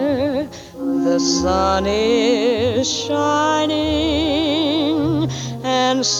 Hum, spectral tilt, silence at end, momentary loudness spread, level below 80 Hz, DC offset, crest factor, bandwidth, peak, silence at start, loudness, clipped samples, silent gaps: none; -4 dB/octave; 0 s; 6 LU; -38 dBFS; under 0.1%; 14 dB; 13.5 kHz; -4 dBFS; 0 s; -18 LUFS; under 0.1%; none